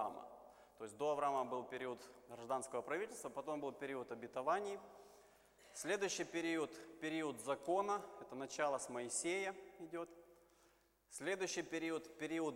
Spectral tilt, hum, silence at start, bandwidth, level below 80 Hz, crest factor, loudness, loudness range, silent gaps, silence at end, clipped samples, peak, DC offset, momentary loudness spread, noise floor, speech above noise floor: -3 dB/octave; none; 0 s; 16.5 kHz; -82 dBFS; 18 dB; -43 LUFS; 3 LU; none; 0 s; under 0.1%; -26 dBFS; under 0.1%; 15 LU; -74 dBFS; 31 dB